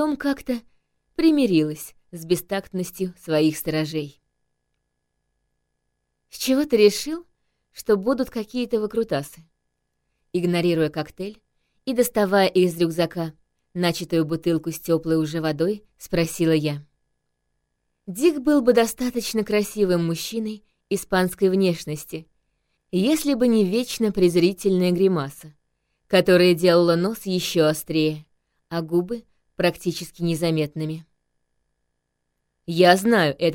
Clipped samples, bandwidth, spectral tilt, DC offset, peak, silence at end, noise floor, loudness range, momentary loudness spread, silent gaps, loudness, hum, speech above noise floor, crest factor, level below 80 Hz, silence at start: under 0.1%; 17 kHz; -5.5 dB/octave; under 0.1%; -2 dBFS; 0 s; -76 dBFS; 6 LU; 15 LU; none; -22 LUFS; 50 Hz at -55 dBFS; 55 dB; 22 dB; -54 dBFS; 0 s